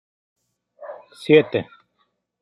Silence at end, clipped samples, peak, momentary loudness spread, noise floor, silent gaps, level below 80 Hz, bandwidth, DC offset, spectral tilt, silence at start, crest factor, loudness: 0.8 s; under 0.1%; -2 dBFS; 24 LU; -70 dBFS; none; -70 dBFS; 11 kHz; under 0.1%; -7 dB/octave; 0.8 s; 22 dB; -18 LUFS